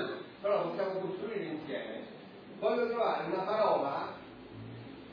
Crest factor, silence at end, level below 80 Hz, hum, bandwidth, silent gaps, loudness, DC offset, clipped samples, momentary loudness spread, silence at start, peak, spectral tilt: 16 dB; 0 s; -72 dBFS; none; 5.2 kHz; none; -34 LUFS; under 0.1%; under 0.1%; 18 LU; 0 s; -18 dBFS; -4 dB/octave